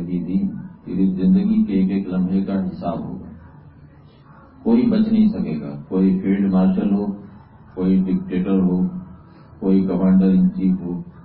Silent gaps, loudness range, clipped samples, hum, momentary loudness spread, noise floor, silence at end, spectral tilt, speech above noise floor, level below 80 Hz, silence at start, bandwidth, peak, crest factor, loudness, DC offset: none; 3 LU; under 0.1%; none; 12 LU; -46 dBFS; 0.05 s; -14 dB/octave; 28 dB; -48 dBFS; 0 s; 4.4 kHz; -4 dBFS; 14 dB; -19 LUFS; under 0.1%